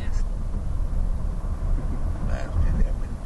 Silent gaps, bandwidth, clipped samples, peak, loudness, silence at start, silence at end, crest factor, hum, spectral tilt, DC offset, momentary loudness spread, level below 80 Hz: none; 7.8 kHz; under 0.1%; -10 dBFS; -29 LUFS; 0 s; 0 s; 14 dB; none; -7.5 dB/octave; under 0.1%; 5 LU; -24 dBFS